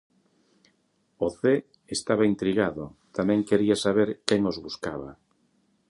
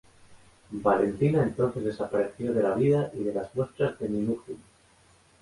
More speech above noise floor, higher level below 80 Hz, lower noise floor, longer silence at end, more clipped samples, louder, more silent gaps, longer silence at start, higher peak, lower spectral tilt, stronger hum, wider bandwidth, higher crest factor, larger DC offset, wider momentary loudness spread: first, 44 dB vs 33 dB; about the same, -58 dBFS vs -58 dBFS; first, -70 dBFS vs -60 dBFS; about the same, 0.75 s vs 0.85 s; neither; about the same, -26 LUFS vs -27 LUFS; neither; first, 1.2 s vs 0.3 s; first, -4 dBFS vs -8 dBFS; second, -5.5 dB/octave vs -8.5 dB/octave; neither; about the same, 11.5 kHz vs 11.5 kHz; about the same, 24 dB vs 20 dB; neither; first, 12 LU vs 8 LU